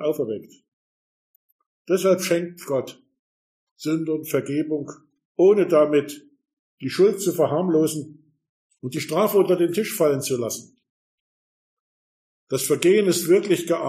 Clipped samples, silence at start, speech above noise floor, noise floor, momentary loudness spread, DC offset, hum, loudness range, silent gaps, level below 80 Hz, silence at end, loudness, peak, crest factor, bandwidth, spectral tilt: under 0.1%; 0 s; over 69 dB; under -90 dBFS; 15 LU; under 0.1%; none; 6 LU; 0.68-1.59 s, 1.66-1.85 s, 3.19-3.76 s, 5.25-5.35 s, 6.53-6.78 s, 8.49-8.70 s, 10.90-12.47 s; -72 dBFS; 0 s; -21 LUFS; -2 dBFS; 22 dB; 15.5 kHz; -5 dB/octave